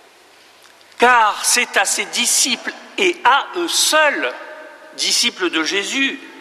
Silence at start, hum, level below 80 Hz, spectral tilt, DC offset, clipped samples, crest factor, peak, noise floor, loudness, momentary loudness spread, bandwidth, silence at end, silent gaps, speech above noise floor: 1 s; none; -64 dBFS; 0.5 dB/octave; under 0.1%; under 0.1%; 16 dB; -2 dBFS; -48 dBFS; -15 LUFS; 10 LU; 15.5 kHz; 0 s; none; 31 dB